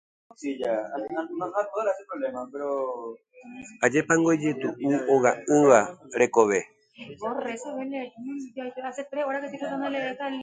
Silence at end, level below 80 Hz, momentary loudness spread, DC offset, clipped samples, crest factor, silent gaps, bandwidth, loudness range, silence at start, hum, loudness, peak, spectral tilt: 0 s; -70 dBFS; 15 LU; under 0.1%; under 0.1%; 22 dB; none; 9.6 kHz; 10 LU; 0.4 s; none; -26 LUFS; -4 dBFS; -5 dB/octave